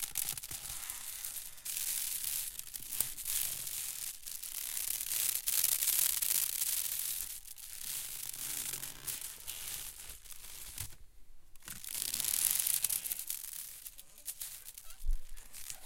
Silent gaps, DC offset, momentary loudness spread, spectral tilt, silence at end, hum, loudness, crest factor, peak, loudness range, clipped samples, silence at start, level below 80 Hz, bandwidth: none; under 0.1%; 17 LU; 1.5 dB/octave; 0 s; none; -35 LUFS; 28 dB; -10 dBFS; 9 LU; under 0.1%; 0 s; -50 dBFS; 17 kHz